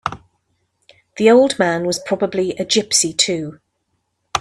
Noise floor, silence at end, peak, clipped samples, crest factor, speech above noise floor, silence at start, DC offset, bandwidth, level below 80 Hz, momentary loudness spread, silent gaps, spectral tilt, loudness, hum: -70 dBFS; 0 s; 0 dBFS; under 0.1%; 18 dB; 54 dB; 0.05 s; under 0.1%; 14 kHz; -56 dBFS; 13 LU; none; -3 dB/octave; -16 LUFS; none